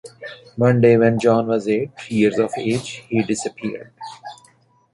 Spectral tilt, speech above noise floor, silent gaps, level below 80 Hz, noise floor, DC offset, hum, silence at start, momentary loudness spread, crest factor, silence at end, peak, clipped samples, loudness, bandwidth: -6.5 dB/octave; 37 dB; none; -58 dBFS; -56 dBFS; under 0.1%; none; 0.05 s; 22 LU; 18 dB; 0.6 s; -2 dBFS; under 0.1%; -19 LUFS; 11.5 kHz